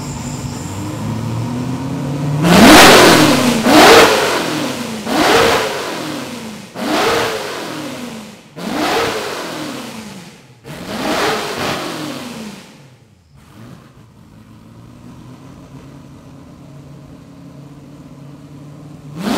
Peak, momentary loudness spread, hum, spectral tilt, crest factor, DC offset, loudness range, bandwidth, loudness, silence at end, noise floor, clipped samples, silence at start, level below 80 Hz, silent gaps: 0 dBFS; 23 LU; none; -3.5 dB/octave; 16 dB; under 0.1%; 15 LU; over 20 kHz; -12 LUFS; 0 s; -46 dBFS; 0.4%; 0 s; -40 dBFS; none